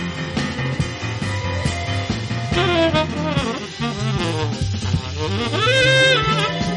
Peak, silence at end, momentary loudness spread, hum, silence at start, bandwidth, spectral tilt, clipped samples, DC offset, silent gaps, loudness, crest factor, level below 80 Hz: -4 dBFS; 0 s; 10 LU; none; 0 s; 11.5 kHz; -5 dB/octave; under 0.1%; under 0.1%; none; -19 LUFS; 16 dB; -38 dBFS